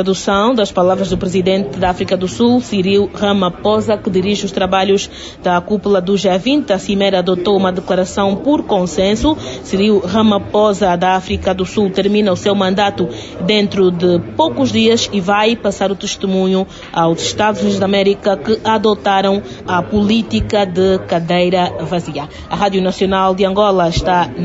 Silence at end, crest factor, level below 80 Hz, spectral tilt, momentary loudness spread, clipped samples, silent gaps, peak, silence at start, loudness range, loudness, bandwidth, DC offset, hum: 0 s; 12 dB; -38 dBFS; -5.5 dB/octave; 5 LU; under 0.1%; none; -2 dBFS; 0 s; 1 LU; -14 LUFS; 8 kHz; under 0.1%; none